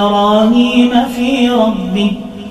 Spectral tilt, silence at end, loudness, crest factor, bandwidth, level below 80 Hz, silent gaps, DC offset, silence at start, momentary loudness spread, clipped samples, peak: -6 dB/octave; 0 s; -11 LUFS; 12 dB; 13.5 kHz; -40 dBFS; none; under 0.1%; 0 s; 6 LU; under 0.1%; 0 dBFS